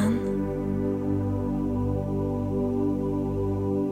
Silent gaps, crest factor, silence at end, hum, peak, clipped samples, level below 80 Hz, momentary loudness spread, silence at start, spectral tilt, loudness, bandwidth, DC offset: none; 12 dB; 0 s; 50 Hz at -35 dBFS; -14 dBFS; under 0.1%; -40 dBFS; 2 LU; 0 s; -9 dB/octave; -27 LUFS; 12 kHz; under 0.1%